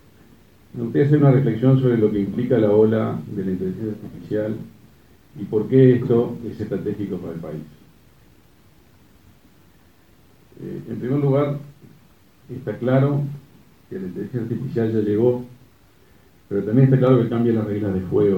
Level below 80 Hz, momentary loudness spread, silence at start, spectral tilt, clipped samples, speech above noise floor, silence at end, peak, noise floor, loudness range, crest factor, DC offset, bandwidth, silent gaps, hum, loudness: -56 dBFS; 18 LU; 0.75 s; -10.5 dB/octave; under 0.1%; 35 dB; 0 s; -2 dBFS; -54 dBFS; 13 LU; 20 dB; 0.2%; 4.8 kHz; none; none; -20 LUFS